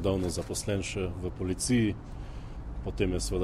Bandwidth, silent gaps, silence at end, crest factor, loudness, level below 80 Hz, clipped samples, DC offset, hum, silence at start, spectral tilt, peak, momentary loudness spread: 15.5 kHz; none; 0 s; 16 dB; -31 LUFS; -40 dBFS; under 0.1%; under 0.1%; none; 0 s; -5 dB/octave; -14 dBFS; 16 LU